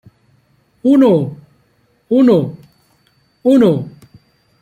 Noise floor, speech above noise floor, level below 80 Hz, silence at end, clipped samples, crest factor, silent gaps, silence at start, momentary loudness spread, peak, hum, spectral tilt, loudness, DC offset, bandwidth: -57 dBFS; 47 dB; -58 dBFS; 0.75 s; under 0.1%; 14 dB; none; 0.85 s; 14 LU; -2 dBFS; none; -9 dB/octave; -13 LUFS; under 0.1%; 9.6 kHz